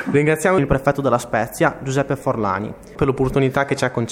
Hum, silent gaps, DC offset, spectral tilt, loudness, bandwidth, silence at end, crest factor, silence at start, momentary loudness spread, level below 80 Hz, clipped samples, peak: none; none; under 0.1%; -6 dB/octave; -19 LUFS; 16.5 kHz; 0 s; 18 dB; 0 s; 6 LU; -40 dBFS; under 0.1%; 0 dBFS